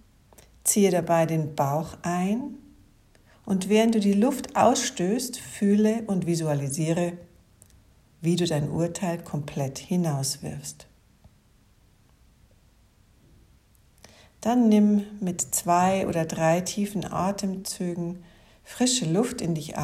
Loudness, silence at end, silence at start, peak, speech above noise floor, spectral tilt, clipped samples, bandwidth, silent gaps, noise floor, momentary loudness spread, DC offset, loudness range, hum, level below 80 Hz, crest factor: -25 LUFS; 0 s; 0.65 s; -6 dBFS; 35 dB; -5 dB/octave; under 0.1%; 16 kHz; none; -60 dBFS; 10 LU; under 0.1%; 8 LU; none; -58 dBFS; 20 dB